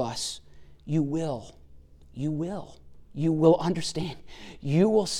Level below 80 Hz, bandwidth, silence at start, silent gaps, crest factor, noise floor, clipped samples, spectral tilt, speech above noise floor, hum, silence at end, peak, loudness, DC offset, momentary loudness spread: -52 dBFS; 13.5 kHz; 0 s; none; 20 dB; -50 dBFS; under 0.1%; -6 dB/octave; 24 dB; none; 0 s; -8 dBFS; -27 LUFS; under 0.1%; 22 LU